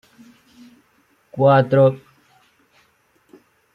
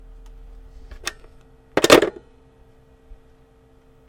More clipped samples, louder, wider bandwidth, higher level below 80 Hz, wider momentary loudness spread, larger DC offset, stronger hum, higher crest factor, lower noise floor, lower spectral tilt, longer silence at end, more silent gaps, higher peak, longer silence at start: neither; about the same, -16 LUFS vs -18 LUFS; second, 5.6 kHz vs 16.5 kHz; second, -64 dBFS vs -46 dBFS; first, 23 LU vs 18 LU; neither; neither; about the same, 20 dB vs 24 dB; first, -60 dBFS vs -53 dBFS; first, -9 dB/octave vs -3 dB/octave; second, 1.75 s vs 2 s; neither; about the same, -2 dBFS vs 0 dBFS; first, 1.35 s vs 0.9 s